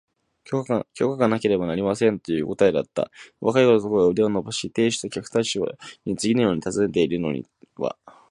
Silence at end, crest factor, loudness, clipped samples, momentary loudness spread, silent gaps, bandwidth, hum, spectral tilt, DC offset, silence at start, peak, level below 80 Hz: 0.2 s; 20 dB; -23 LUFS; under 0.1%; 11 LU; none; 11.5 kHz; none; -5.5 dB/octave; under 0.1%; 0.5 s; -4 dBFS; -56 dBFS